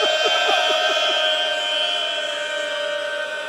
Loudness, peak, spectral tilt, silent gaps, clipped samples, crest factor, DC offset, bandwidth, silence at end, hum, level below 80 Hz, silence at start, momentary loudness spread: -19 LUFS; -6 dBFS; 1 dB/octave; none; under 0.1%; 16 dB; under 0.1%; 16 kHz; 0 s; none; -78 dBFS; 0 s; 7 LU